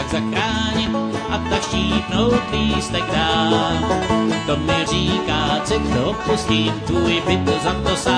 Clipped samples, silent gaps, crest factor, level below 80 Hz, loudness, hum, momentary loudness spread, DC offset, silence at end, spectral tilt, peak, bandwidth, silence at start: under 0.1%; none; 16 dB; -34 dBFS; -19 LUFS; none; 3 LU; under 0.1%; 0 s; -5 dB/octave; -4 dBFS; 10.5 kHz; 0 s